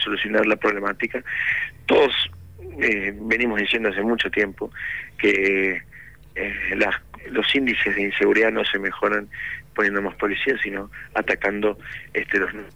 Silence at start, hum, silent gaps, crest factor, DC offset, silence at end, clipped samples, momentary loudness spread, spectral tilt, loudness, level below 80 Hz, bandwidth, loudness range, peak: 0 s; none; none; 16 dB; 0.3%; 0.05 s; under 0.1%; 11 LU; -5 dB/octave; -22 LUFS; -50 dBFS; 19.5 kHz; 2 LU; -8 dBFS